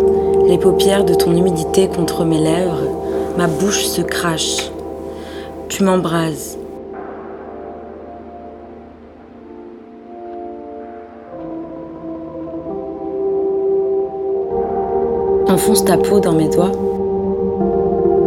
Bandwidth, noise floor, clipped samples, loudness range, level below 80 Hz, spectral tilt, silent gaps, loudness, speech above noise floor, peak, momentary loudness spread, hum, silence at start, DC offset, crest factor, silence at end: 16.5 kHz; -38 dBFS; under 0.1%; 18 LU; -40 dBFS; -5 dB/octave; none; -16 LUFS; 24 dB; 0 dBFS; 21 LU; none; 0 s; under 0.1%; 18 dB; 0 s